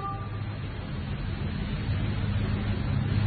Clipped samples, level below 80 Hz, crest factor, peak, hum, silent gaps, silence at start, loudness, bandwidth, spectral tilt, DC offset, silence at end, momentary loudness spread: under 0.1%; -38 dBFS; 14 dB; -14 dBFS; none; none; 0 s; -31 LUFS; 4.7 kHz; -11 dB/octave; under 0.1%; 0 s; 6 LU